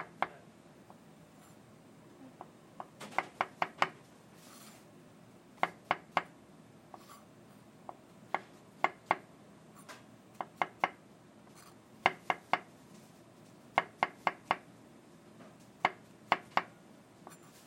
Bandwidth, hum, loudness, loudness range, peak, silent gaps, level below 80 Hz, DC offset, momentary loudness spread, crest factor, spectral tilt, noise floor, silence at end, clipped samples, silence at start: 16.5 kHz; none; -36 LUFS; 4 LU; -8 dBFS; none; -82 dBFS; under 0.1%; 24 LU; 32 dB; -3.5 dB/octave; -58 dBFS; 0.3 s; under 0.1%; 0 s